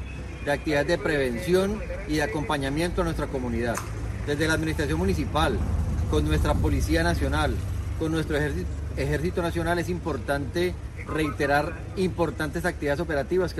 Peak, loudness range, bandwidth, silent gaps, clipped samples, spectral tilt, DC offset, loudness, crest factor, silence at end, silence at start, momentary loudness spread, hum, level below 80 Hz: -8 dBFS; 2 LU; 13.5 kHz; none; under 0.1%; -6 dB/octave; under 0.1%; -26 LUFS; 16 dB; 0 s; 0 s; 6 LU; none; -32 dBFS